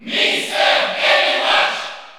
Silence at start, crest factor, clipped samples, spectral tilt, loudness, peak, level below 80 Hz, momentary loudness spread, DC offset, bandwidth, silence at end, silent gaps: 0 s; 16 dB; under 0.1%; -0.5 dB/octave; -15 LUFS; -2 dBFS; -70 dBFS; 3 LU; under 0.1%; over 20 kHz; 0 s; none